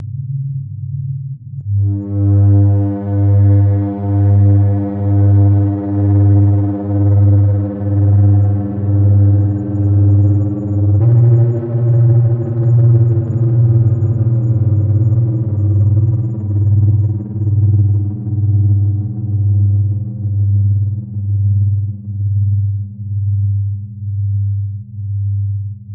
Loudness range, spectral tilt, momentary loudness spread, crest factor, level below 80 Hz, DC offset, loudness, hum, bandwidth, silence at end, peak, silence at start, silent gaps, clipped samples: 5 LU; -14 dB/octave; 11 LU; 12 dB; -46 dBFS; under 0.1%; -14 LUFS; none; 1.8 kHz; 0 s; -2 dBFS; 0 s; none; under 0.1%